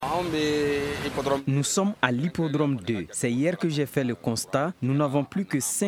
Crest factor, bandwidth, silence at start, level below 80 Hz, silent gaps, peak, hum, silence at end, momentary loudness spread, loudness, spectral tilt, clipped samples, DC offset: 22 dB; 17.5 kHz; 0 s; -54 dBFS; none; -2 dBFS; none; 0 s; 4 LU; -26 LUFS; -5 dB/octave; under 0.1%; under 0.1%